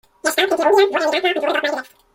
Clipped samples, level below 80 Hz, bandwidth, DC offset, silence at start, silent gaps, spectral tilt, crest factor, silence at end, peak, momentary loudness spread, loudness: under 0.1%; -64 dBFS; 16.5 kHz; under 0.1%; 0.25 s; none; -1 dB/octave; 16 dB; 0.3 s; -4 dBFS; 7 LU; -17 LUFS